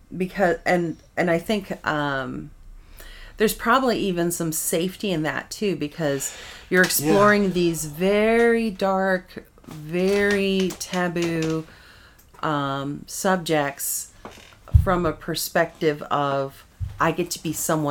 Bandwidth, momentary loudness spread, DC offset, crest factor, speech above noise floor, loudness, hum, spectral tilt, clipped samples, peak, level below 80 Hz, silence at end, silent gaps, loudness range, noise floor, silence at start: 19 kHz; 13 LU; under 0.1%; 20 dB; 27 dB; -23 LUFS; none; -4.5 dB/octave; under 0.1%; -2 dBFS; -38 dBFS; 0 s; none; 5 LU; -50 dBFS; 0.1 s